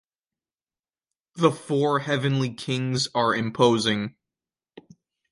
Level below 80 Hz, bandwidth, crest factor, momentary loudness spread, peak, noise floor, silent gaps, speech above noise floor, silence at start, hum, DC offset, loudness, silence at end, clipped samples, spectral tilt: -64 dBFS; 11.5 kHz; 22 dB; 7 LU; -4 dBFS; under -90 dBFS; none; over 67 dB; 1.35 s; none; under 0.1%; -24 LUFS; 0.5 s; under 0.1%; -5.5 dB/octave